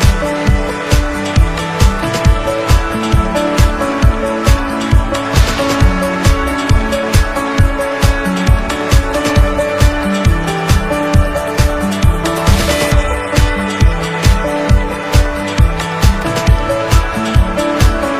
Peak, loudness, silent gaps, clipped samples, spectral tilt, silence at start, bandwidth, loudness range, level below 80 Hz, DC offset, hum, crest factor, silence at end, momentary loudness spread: 0 dBFS; -14 LUFS; none; 0.5%; -5.5 dB/octave; 0 s; 16 kHz; 1 LU; -16 dBFS; under 0.1%; none; 12 dB; 0 s; 2 LU